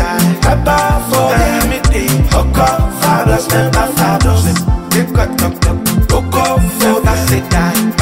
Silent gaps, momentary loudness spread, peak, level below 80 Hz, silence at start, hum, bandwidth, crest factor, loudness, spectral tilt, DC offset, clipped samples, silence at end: none; 3 LU; 0 dBFS; -18 dBFS; 0 s; none; 16.5 kHz; 12 dB; -12 LUFS; -5 dB/octave; under 0.1%; under 0.1%; 0 s